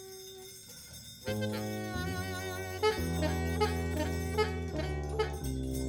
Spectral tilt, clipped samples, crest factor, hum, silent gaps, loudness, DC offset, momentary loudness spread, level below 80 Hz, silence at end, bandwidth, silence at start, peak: -5.5 dB/octave; under 0.1%; 18 dB; none; none; -34 LUFS; under 0.1%; 14 LU; -44 dBFS; 0 s; over 20 kHz; 0 s; -16 dBFS